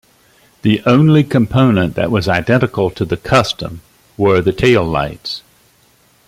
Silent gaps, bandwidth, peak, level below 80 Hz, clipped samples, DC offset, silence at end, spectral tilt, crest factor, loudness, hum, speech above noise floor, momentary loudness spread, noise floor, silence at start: none; 15.5 kHz; 0 dBFS; -40 dBFS; under 0.1%; under 0.1%; 0.9 s; -7 dB/octave; 14 dB; -14 LUFS; none; 39 dB; 11 LU; -52 dBFS; 0.65 s